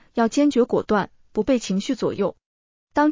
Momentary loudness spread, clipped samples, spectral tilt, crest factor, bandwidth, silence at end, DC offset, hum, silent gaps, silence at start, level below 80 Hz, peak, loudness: 8 LU; under 0.1%; -5.5 dB/octave; 14 dB; 7.6 kHz; 0 s; under 0.1%; none; 2.46-2.87 s; 0.15 s; -54 dBFS; -8 dBFS; -22 LUFS